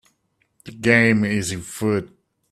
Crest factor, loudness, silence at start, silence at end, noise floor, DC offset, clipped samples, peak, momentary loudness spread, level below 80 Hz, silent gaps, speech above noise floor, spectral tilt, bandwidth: 22 dB; -20 LUFS; 0.65 s; 0.45 s; -68 dBFS; under 0.1%; under 0.1%; 0 dBFS; 11 LU; -54 dBFS; none; 49 dB; -5.5 dB/octave; 14 kHz